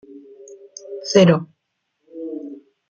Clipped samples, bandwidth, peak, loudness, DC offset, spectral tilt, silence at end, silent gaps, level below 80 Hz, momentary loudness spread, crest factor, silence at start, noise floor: under 0.1%; 7.6 kHz; -2 dBFS; -17 LUFS; under 0.1%; -6 dB/octave; 0.35 s; none; -64 dBFS; 25 LU; 20 dB; 0.15 s; -74 dBFS